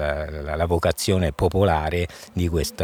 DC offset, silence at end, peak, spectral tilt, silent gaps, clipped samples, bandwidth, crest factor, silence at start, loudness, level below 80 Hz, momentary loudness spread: under 0.1%; 0 s; -6 dBFS; -5.5 dB/octave; none; under 0.1%; 18.5 kHz; 16 dB; 0 s; -23 LUFS; -34 dBFS; 8 LU